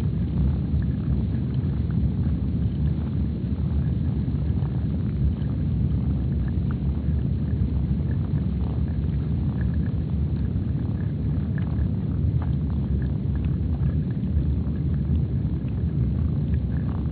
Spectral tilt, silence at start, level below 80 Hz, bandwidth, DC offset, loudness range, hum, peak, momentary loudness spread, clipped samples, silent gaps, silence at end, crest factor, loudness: -10.5 dB/octave; 0 s; -28 dBFS; 4.5 kHz; under 0.1%; 1 LU; none; -10 dBFS; 2 LU; under 0.1%; none; 0 s; 12 dB; -25 LUFS